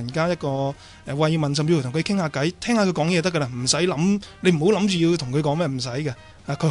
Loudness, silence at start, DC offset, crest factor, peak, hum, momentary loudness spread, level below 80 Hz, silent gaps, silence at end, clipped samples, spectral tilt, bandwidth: -22 LUFS; 0 s; under 0.1%; 16 dB; -6 dBFS; none; 9 LU; -54 dBFS; none; 0 s; under 0.1%; -5.5 dB/octave; 11 kHz